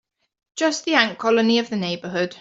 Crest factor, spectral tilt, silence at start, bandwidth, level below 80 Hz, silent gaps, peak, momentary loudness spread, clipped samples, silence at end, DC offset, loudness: 18 dB; -4 dB/octave; 0.55 s; 8 kHz; -68 dBFS; none; -2 dBFS; 8 LU; under 0.1%; 0.05 s; under 0.1%; -20 LUFS